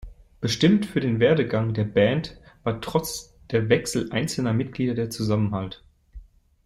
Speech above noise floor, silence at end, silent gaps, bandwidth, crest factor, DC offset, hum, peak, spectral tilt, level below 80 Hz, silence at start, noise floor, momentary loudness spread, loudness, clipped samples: 23 dB; 0.45 s; none; 15.5 kHz; 18 dB; under 0.1%; none; -6 dBFS; -6 dB/octave; -50 dBFS; 0 s; -46 dBFS; 12 LU; -24 LUFS; under 0.1%